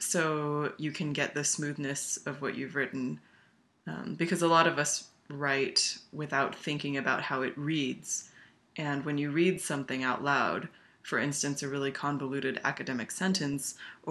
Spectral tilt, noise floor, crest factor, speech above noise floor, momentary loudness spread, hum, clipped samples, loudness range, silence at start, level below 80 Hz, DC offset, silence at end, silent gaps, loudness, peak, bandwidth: -3.5 dB/octave; -66 dBFS; 24 dB; 34 dB; 11 LU; none; under 0.1%; 4 LU; 0 s; -74 dBFS; under 0.1%; 0 s; none; -31 LUFS; -10 dBFS; 13 kHz